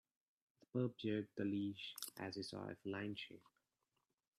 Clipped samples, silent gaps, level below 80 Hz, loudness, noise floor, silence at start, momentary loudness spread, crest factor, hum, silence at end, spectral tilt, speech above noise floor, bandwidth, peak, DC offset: under 0.1%; none; -86 dBFS; -46 LUFS; -89 dBFS; 0.75 s; 7 LU; 20 dB; none; 1 s; -5.5 dB/octave; 43 dB; 14 kHz; -28 dBFS; under 0.1%